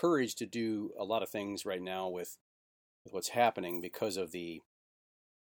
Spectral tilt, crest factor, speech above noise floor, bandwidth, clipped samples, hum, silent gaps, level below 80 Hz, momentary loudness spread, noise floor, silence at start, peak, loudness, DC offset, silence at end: -4 dB/octave; 22 dB; over 55 dB; over 20 kHz; under 0.1%; none; 2.41-3.05 s; -78 dBFS; 14 LU; under -90 dBFS; 0 s; -14 dBFS; -36 LUFS; under 0.1%; 0.8 s